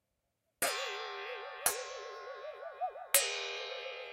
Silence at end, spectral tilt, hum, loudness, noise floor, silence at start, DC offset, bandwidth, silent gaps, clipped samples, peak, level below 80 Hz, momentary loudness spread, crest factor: 0 s; 1.5 dB/octave; none; -35 LUFS; -83 dBFS; 0.6 s; under 0.1%; 16 kHz; none; under 0.1%; -8 dBFS; -78 dBFS; 16 LU; 30 dB